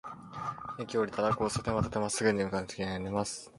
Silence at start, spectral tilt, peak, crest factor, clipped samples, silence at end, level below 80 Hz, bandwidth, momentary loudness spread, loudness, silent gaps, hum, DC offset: 0.05 s; -5 dB/octave; -14 dBFS; 20 dB; under 0.1%; 0 s; -54 dBFS; 11.5 kHz; 10 LU; -32 LUFS; none; none; under 0.1%